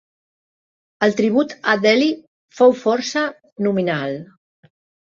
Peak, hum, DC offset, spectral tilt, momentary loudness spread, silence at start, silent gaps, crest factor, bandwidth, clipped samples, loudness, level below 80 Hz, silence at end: 0 dBFS; none; under 0.1%; -5 dB/octave; 10 LU; 1 s; 2.27-2.48 s, 3.52-3.56 s; 20 dB; 7.6 kHz; under 0.1%; -18 LUFS; -64 dBFS; 0.8 s